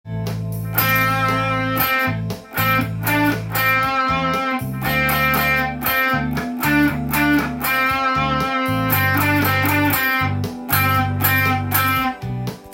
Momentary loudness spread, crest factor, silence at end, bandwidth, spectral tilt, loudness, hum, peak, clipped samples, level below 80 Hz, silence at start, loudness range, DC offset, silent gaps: 6 LU; 18 dB; 0 s; 17 kHz; -5 dB/octave; -18 LUFS; none; -2 dBFS; under 0.1%; -40 dBFS; 0.05 s; 1 LU; under 0.1%; none